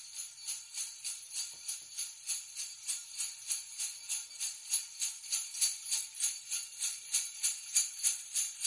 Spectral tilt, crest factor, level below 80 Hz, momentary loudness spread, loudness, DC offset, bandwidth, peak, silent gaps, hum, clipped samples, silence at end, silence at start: 5.5 dB/octave; 24 dB; -90 dBFS; 9 LU; -35 LUFS; under 0.1%; 11.5 kHz; -14 dBFS; none; none; under 0.1%; 0 s; 0 s